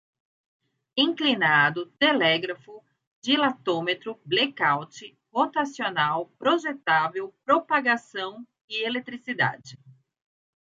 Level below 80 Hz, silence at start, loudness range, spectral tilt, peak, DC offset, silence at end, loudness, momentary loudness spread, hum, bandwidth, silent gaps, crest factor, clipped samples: -78 dBFS; 0.95 s; 3 LU; -4.5 dB/octave; -8 dBFS; under 0.1%; 0.85 s; -24 LUFS; 13 LU; none; 7.8 kHz; 3.07-3.22 s, 8.61-8.68 s; 20 dB; under 0.1%